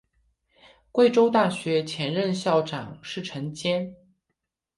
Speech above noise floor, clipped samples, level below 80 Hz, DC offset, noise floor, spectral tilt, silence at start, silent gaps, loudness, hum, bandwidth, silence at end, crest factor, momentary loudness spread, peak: 57 dB; under 0.1%; -66 dBFS; under 0.1%; -81 dBFS; -5.5 dB/octave; 0.95 s; none; -25 LUFS; none; 11.5 kHz; 0.85 s; 18 dB; 14 LU; -8 dBFS